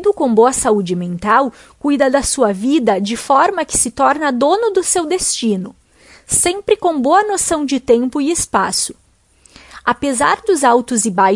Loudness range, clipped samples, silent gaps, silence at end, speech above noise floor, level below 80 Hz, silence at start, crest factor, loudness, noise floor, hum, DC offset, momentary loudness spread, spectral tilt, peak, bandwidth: 2 LU; under 0.1%; none; 0 s; 37 dB; -44 dBFS; 0 s; 16 dB; -15 LUFS; -51 dBFS; none; under 0.1%; 6 LU; -3.5 dB/octave; 0 dBFS; 11.5 kHz